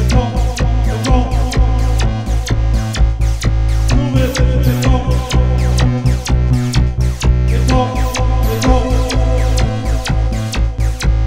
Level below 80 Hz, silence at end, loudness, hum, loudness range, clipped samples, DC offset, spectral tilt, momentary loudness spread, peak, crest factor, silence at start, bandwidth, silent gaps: -14 dBFS; 0 s; -15 LUFS; none; 1 LU; under 0.1%; under 0.1%; -6 dB/octave; 4 LU; 0 dBFS; 12 dB; 0 s; 15.5 kHz; none